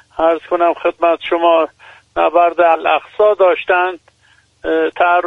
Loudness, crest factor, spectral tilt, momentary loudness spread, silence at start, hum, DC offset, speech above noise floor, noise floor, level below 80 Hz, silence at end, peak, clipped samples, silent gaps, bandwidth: -14 LUFS; 14 dB; -5 dB/octave; 8 LU; 0.15 s; none; under 0.1%; 40 dB; -53 dBFS; -52 dBFS; 0 s; 0 dBFS; under 0.1%; none; 4 kHz